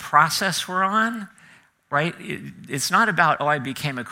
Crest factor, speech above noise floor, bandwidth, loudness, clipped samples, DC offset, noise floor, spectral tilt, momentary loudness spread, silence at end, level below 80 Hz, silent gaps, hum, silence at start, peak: 20 dB; 31 dB; 16.5 kHz; -21 LUFS; under 0.1%; under 0.1%; -53 dBFS; -3.5 dB/octave; 15 LU; 0 s; -66 dBFS; none; none; 0 s; -2 dBFS